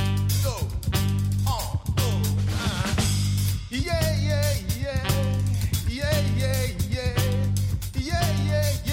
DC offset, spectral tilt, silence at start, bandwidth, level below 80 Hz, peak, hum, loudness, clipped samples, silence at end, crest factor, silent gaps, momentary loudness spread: under 0.1%; -5 dB/octave; 0 s; 16.5 kHz; -34 dBFS; -10 dBFS; 50 Hz at -35 dBFS; -25 LUFS; under 0.1%; 0 s; 14 dB; none; 4 LU